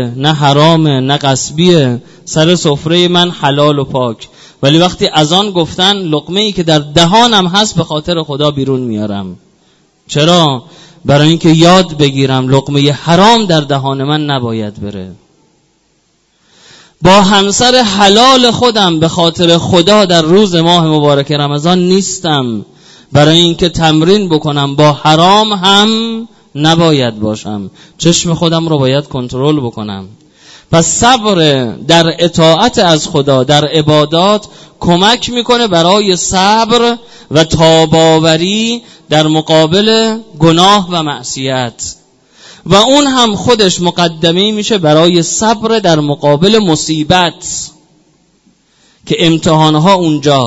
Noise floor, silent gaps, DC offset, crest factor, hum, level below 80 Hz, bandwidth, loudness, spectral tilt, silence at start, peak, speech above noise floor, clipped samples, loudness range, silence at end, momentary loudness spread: -55 dBFS; none; under 0.1%; 10 dB; none; -40 dBFS; 11 kHz; -9 LUFS; -4.5 dB/octave; 0 s; 0 dBFS; 46 dB; 1%; 5 LU; 0 s; 10 LU